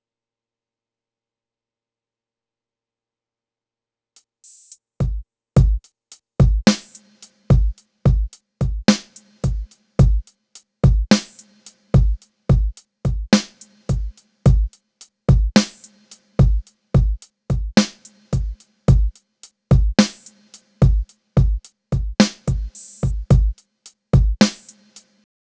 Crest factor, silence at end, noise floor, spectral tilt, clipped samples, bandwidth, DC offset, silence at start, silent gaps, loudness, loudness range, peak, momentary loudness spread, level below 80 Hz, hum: 20 dB; 0.95 s; under -90 dBFS; -6 dB/octave; under 0.1%; 8 kHz; under 0.1%; 5 s; none; -20 LUFS; 2 LU; 0 dBFS; 11 LU; -24 dBFS; none